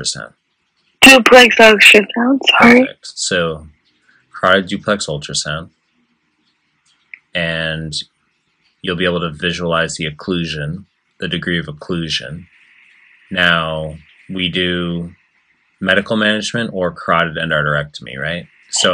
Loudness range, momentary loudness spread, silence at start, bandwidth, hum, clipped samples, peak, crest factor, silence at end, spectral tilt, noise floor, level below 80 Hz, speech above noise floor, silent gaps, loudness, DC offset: 14 LU; 20 LU; 0 s; over 20 kHz; none; 0.4%; 0 dBFS; 16 dB; 0 s; -3.5 dB/octave; -64 dBFS; -48 dBFS; 50 dB; none; -13 LUFS; under 0.1%